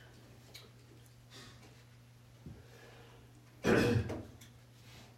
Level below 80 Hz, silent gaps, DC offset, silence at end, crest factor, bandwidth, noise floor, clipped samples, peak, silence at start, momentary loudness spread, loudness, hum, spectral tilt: -62 dBFS; none; under 0.1%; 0.1 s; 24 dB; 16 kHz; -59 dBFS; under 0.1%; -16 dBFS; 0.55 s; 28 LU; -33 LUFS; none; -6 dB/octave